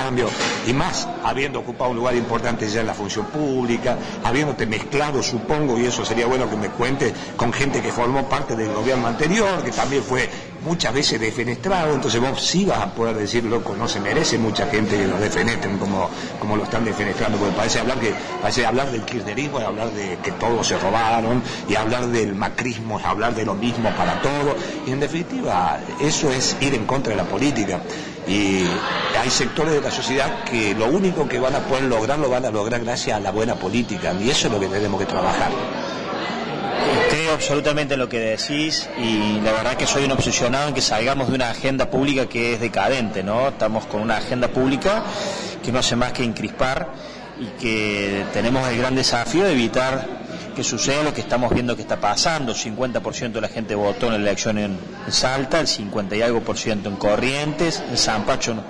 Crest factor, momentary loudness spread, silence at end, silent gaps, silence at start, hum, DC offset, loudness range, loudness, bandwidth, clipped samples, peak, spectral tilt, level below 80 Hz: 14 dB; 6 LU; 0 s; none; 0 s; none; under 0.1%; 2 LU; -21 LUFS; 10.5 kHz; under 0.1%; -6 dBFS; -4 dB/octave; -40 dBFS